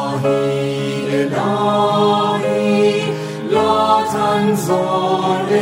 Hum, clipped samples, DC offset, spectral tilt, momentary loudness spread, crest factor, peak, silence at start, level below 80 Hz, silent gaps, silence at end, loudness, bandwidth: none; under 0.1%; under 0.1%; -5.5 dB/octave; 5 LU; 14 dB; -2 dBFS; 0 s; -60 dBFS; none; 0 s; -16 LUFS; 16 kHz